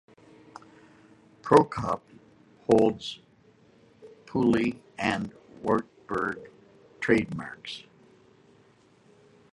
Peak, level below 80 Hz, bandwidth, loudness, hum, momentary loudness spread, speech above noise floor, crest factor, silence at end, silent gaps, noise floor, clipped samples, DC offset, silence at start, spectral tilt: -2 dBFS; -60 dBFS; 11.5 kHz; -27 LUFS; none; 19 LU; 35 dB; 26 dB; 1.75 s; none; -60 dBFS; under 0.1%; under 0.1%; 1.45 s; -6.5 dB/octave